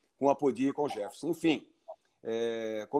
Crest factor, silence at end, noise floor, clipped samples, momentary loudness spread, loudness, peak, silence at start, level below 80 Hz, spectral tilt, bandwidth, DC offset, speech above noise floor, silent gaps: 20 dB; 0 s; -53 dBFS; under 0.1%; 20 LU; -32 LUFS; -12 dBFS; 0.2 s; -78 dBFS; -5.5 dB/octave; 12.5 kHz; under 0.1%; 22 dB; none